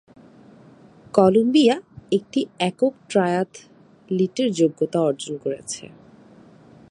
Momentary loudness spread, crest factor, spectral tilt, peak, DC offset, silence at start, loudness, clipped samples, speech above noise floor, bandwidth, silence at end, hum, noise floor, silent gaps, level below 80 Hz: 12 LU; 22 dB; -5.5 dB/octave; 0 dBFS; under 0.1%; 1.15 s; -21 LUFS; under 0.1%; 28 dB; 11.5 kHz; 1.1 s; none; -49 dBFS; none; -64 dBFS